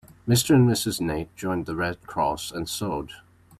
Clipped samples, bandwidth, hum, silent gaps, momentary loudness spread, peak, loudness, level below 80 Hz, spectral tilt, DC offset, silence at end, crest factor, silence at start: under 0.1%; 15.5 kHz; none; none; 12 LU; -8 dBFS; -25 LUFS; -50 dBFS; -5 dB/octave; under 0.1%; 0.45 s; 18 dB; 0.25 s